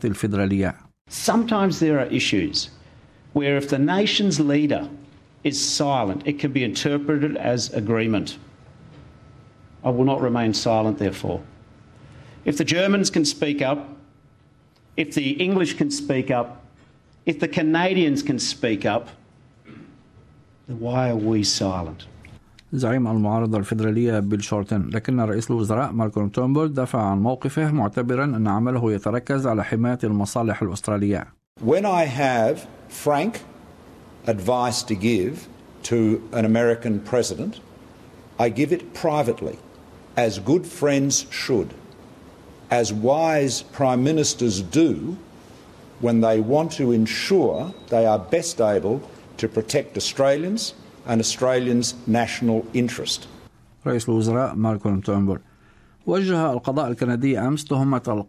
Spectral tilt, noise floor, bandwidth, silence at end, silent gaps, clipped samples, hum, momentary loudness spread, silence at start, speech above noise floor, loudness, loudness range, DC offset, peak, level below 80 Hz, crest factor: -5 dB/octave; -55 dBFS; 14.5 kHz; 0.05 s; 1.01-1.05 s, 31.47-31.56 s; under 0.1%; none; 9 LU; 0 s; 34 dB; -22 LUFS; 3 LU; under 0.1%; -6 dBFS; -50 dBFS; 18 dB